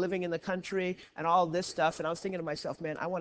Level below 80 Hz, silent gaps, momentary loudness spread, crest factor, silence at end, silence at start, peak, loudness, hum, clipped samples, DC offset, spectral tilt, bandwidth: -68 dBFS; none; 8 LU; 18 dB; 0 s; 0 s; -14 dBFS; -33 LUFS; none; under 0.1%; under 0.1%; -5 dB/octave; 8 kHz